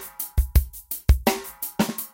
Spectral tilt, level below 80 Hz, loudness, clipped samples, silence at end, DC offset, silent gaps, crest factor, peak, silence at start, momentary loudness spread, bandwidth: -5 dB/octave; -26 dBFS; -25 LUFS; under 0.1%; 0.05 s; under 0.1%; none; 18 dB; -4 dBFS; 0 s; 8 LU; 17 kHz